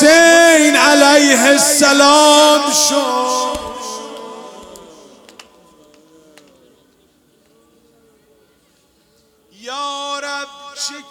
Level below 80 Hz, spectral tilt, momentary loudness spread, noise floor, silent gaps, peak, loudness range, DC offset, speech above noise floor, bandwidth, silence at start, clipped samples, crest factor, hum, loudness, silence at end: -54 dBFS; -0.5 dB/octave; 21 LU; -56 dBFS; none; 0 dBFS; 23 LU; under 0.1%; 45 dB; 18.5 kHz; 0 s; under 0.1%; 14 dB; none; -10 LUFS; 0.1 s